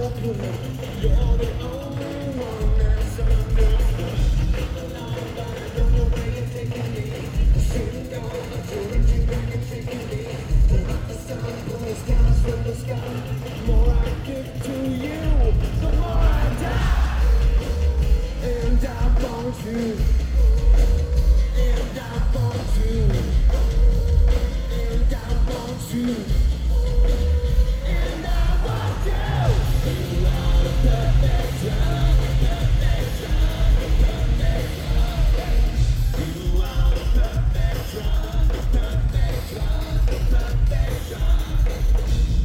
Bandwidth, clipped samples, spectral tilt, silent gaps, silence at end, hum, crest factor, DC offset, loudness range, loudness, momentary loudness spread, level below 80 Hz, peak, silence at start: 15.5 kHz; under 0.1%; -6.5 dB/octave; none; 0 s; none; 14 dB; under 0.1%; 3 LU; -23 LUFS; 8 LU; -20 dBFS; -6 dBFS; 0 s